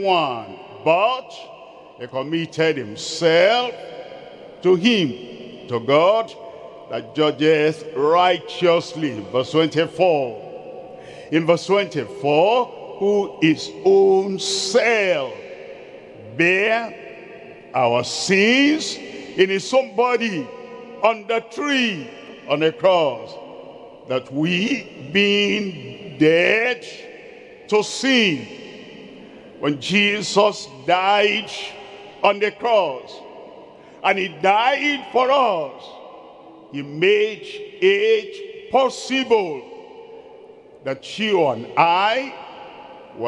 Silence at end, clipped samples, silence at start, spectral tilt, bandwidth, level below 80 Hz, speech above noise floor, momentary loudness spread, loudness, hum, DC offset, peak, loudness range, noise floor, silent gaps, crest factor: 0 s; under 0.1%; 0 s; -4 dB/octave; 11.5 kHz; -68 dBFS; 25 dB; 22 LU; -19 LUFS; none; under 0.1%; 0 dBFS; 3 LU; -44 dBFS; none; 20 dB